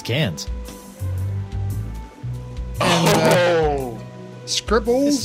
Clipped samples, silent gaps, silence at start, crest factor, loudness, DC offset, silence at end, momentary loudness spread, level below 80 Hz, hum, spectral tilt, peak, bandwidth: under 0.1%; none; 0 s; 18 dB; -20 LUFS; under 0.1%; 0 s; 18 LU; -34 dBFS; none; -4.5 dB/octave; -4 dBFS; 16 kHz